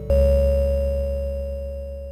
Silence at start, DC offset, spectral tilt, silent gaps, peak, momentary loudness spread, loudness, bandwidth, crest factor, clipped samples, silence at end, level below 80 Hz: 0 s; under 0.1%; -9 dB/octave; none; -8 dBFS; 13 LU; -23 LUFS; 14.5 kHz; 12 dB; under 0.1%; 0 s; -24 dBFS